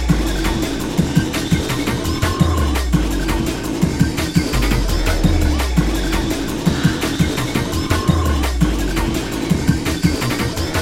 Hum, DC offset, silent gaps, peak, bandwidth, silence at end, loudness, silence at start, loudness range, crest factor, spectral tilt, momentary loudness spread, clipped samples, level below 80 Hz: none; under 0.1%; none; 0 dBFS; 16.5 kHz; 0 s; -18 LUFS; 0 s; 1 LU; 16 dB; -5.5 dB/octave; 3 LU; under 0.1%; -22 dBFS